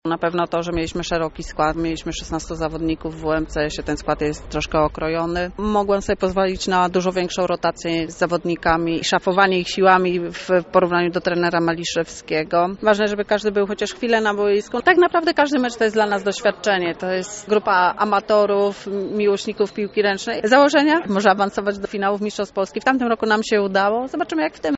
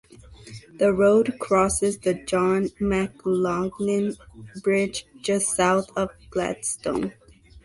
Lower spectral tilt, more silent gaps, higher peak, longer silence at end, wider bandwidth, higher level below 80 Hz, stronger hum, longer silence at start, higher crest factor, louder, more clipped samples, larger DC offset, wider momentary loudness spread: about the same, -3.5 dB/octave vs -4.5 dB/octave; neither; first, 0 dBFS vs -8 dBFS; about the same, 0 s vs 0.05 s; second, 8 kHz vs 12 kHz; first, -42 dBFS vs -50 dBFS; neither; second, 0.05 s vs 0.3 s; about the same, 18 dB vs 16 dB; first, -20 LUFS vs -23 LUFS; neither; neither; about the same, 8 LU vs 10 LU